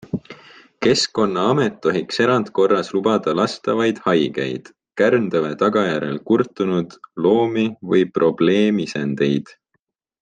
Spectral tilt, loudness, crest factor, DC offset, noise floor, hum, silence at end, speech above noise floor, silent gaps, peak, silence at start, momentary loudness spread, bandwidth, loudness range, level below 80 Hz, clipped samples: -5.5 dB/octave; -19 LUFS; 16 dB; under 0.1%; -72 dBFS; none; 0.8 s; 54 dB; none; -4 dBFS; 0.15 s; 7 LU; 9.6 kHz; 1 LU; -62 dBFS; under 0.1%